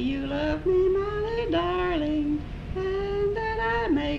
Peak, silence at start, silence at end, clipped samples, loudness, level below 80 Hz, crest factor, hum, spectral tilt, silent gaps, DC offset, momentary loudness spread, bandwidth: -14 dBFS; 0 s; 0 s; under 0.1%; -27 LUFS; -38 dBFS; 12 dB; none; -7.5 dB/octave; none; under 0.1%; 6 LU; 7.2 kHz